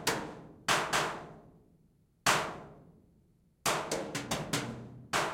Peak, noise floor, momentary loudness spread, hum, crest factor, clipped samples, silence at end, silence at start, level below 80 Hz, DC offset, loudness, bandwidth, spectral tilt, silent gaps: -12 dBFS; -68 dBFS; 17 LU; none; 22 dB; under 0.1%; 0 s; 0 s; -62 dBFS; under 0.1%; -33 LUFS; 16.5 kHz; -2.5 dB/octave; none